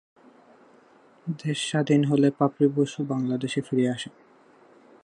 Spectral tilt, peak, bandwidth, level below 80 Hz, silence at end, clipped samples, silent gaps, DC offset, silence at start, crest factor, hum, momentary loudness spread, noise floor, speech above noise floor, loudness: -6.5 dB/octave; -8 dBFS; 10.5 kHz; -72 dBFS; 0.95 s; under 0.1%; none; under 0.1%; 1.25 s; 18 dB; none; 13 LU; -56 dBFS; 32 dB; -25 LUFS